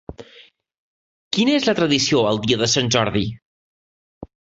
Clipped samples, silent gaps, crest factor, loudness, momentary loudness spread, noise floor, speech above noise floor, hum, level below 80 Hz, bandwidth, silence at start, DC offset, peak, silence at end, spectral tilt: under 0.1%; 0.79-1.31 s, 3.42-4.21 s; 18 dB; -18 LUFS; 8 LU; -50 dBFS; 32 dB; none; -50 dBFS; 8 kHz; 0.1 s; under 0.1%; -4 dBFS; 0.35 s; -4 dB/octave